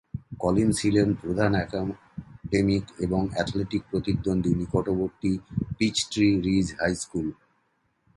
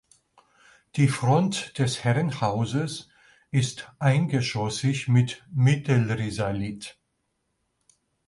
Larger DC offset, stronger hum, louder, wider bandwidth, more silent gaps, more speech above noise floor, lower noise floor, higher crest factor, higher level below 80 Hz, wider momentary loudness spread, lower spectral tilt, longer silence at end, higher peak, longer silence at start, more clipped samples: neither; neither; about the same, -26 LUFS vs -25 LUFS; about the same, 11.5 kHz vs 11.5 kHz; neither; second, 46 dB vs 52 dB; second, -71 dBFS vs -76 dBFS; about the same, 18 dB vs 16 dB; first, -46 dBFS vs -56 dBFS; about the same, 9 LU vs 9 LU; about the same, -5.5 dB/octave vs -6 dB/octave; second, 0.85 s vs 1.35 s; about the same, -8 dBFS vs -10 dBFS; second, 0.15 s vs 0.95 s; neither